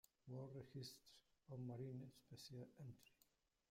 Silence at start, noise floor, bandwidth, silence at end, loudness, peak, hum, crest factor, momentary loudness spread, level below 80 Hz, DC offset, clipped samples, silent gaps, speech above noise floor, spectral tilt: 0.25 s; -83 dBFS; 16 kHz; 0.55 s; -57 LUFS; -42 dBFS; none; 16 dB; 9 LU; -84 dBFS; under 0.1%; under 0.1%; none; 26 dB; -6.5 dB/octave